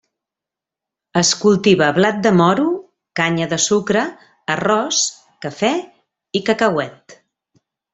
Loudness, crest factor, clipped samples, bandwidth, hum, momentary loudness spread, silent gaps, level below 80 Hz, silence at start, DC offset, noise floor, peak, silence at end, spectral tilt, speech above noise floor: -17 LUFS; 16 dB; under 0.1%; 8.4 kHz; none; 13 LU; none; -58 dBFS; 1.15 s; under 0.1%; -86 dBFS; -2 dBFS; 0.8 s; -4 dB/octave; 70 dB